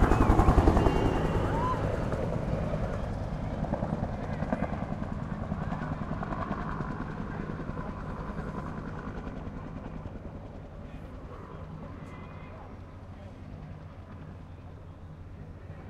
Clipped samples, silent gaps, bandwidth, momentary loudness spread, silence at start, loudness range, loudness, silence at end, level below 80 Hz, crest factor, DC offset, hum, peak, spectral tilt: under 0.1%; none; 12.5 kHz; 19 LU; 0 s; 15 LU; -32 LUFS; 0 s; -36 dBFS; 24 dB; under 0.1%; none; -8 dBFS; -8 dB/octave